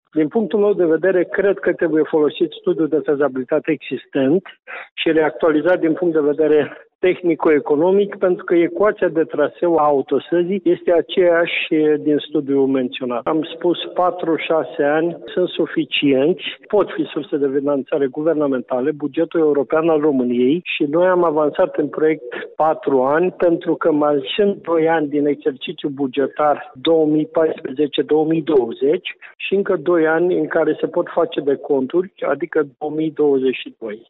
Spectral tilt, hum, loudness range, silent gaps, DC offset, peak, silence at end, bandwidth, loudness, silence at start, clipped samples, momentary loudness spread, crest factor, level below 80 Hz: -9.5 dB/octave; none; 2 LU; 4.91-4.96 s, 6.95-6.99 s; under 0.1%; -6 dBFS; 0.1 s; 4.1 kHz; -18 LUFS; 0.15 s; under 0.1%; 6 LU; 12 dB; -62 dBFS